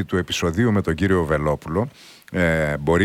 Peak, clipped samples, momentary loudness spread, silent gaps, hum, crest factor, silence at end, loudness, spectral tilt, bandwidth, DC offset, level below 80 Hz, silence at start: -6 dBFS; under 0.1%; 6 LU; none; none; 14 dB; 0 s; -21 LUFS; -6 dB/octave; 16.5 kHz; under 0.1%; -38 dBFS; 0 s